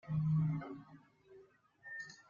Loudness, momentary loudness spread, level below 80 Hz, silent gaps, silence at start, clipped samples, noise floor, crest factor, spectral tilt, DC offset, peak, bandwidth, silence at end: -38 LUFS; 22 LU; -68 dBFS; none; 0.05 s; under 0.1%; -64 dBFS; 14 dB; -8.5 dB/octave; under 0.1%; -26 dBFS; 7.2 kHz; 0.1 s